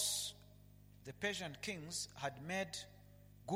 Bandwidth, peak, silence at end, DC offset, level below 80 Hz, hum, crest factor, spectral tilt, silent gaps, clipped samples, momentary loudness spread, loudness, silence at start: 16.5 kHz; -24 dBFS; 0 s; under 0.1%; -70 dBFS; 50 Hz at -60 dBFS; 20 dB; -2.5 dB/octave; none; under 0.1%; 22 LU; -43 LUFS; 0 s